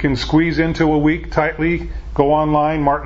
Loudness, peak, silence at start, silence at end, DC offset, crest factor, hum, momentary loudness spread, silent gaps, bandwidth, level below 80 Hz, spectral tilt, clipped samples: -17 LUFS; 0 dBFS; 0 s; 0 s; under 0.1%; 16 dB; none; 5 LU; none; 7.6 kHz; -30 dBFS; -7.5 dB/octave; under 0.1%